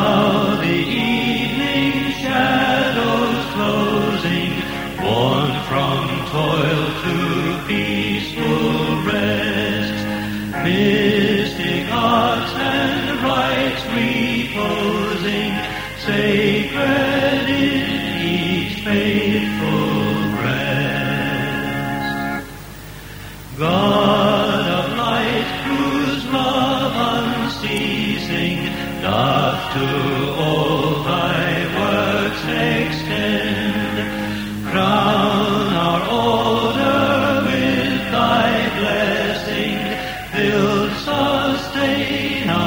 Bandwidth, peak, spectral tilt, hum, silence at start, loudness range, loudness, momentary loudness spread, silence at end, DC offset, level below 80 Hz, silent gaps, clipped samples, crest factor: over 20 kHz; -2 dBFS; -5.5 dB/octave; 50 Hz at -40 dBFS; 0 s; 2 LU; -18 LUFS; 6 LU; 0 s; under 0.1%; -42 dBFS; none; under 0.1%; 16 dB